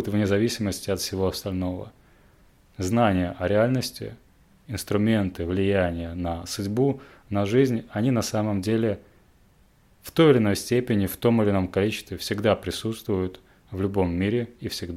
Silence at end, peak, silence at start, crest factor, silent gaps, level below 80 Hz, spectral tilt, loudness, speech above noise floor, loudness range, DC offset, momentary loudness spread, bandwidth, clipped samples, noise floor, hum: 0 s; -6 dBFS; 0 s; 20 dB; none; -54 dBFS; -6 dB/octave; -25 LUFS; 34 dB; 4 LU; under 0.1%; 11 LU; 16.5 kHz; under 0.1%; -58 dBFS; none